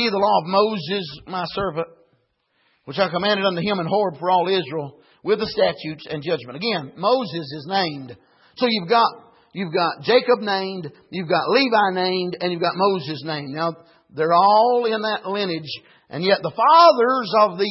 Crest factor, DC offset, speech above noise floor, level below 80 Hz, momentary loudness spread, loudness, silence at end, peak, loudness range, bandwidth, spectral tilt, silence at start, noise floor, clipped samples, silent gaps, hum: 18 dB; under 0.1%; 47 dB; -62 dBFS; 14 LU; -20 LUFS; 0 s; -2 dBFS; 6 LU; 5.8 kHz; -8.5 dB/octave; 0 s; -67 dBFS; under 0.1%; none; none